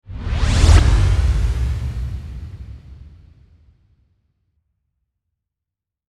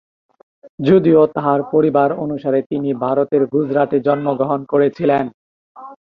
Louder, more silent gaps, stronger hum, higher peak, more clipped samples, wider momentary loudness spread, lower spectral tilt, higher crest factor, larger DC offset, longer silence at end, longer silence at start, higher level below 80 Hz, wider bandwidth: about the same, -18 LUFS vs -16 LUFS; second, none vs 0.69-0.78 s, 2.66-2.70 s, 5.34-5.75 s; neither; about the same, 0 dBFS vs -2 dBFS; neither; first, 23 LU vs 7 LU; second, -5.5 dB/octave vs -10 dB/octave; first, 20 dB vs 14 dB; neither; first, 3 s vs 0.15 s; second, 0.1 s vs 0.65 s; first, -22 dBFS vs -58 dBFS; first, 11.5 kHz vs 5.4 kHz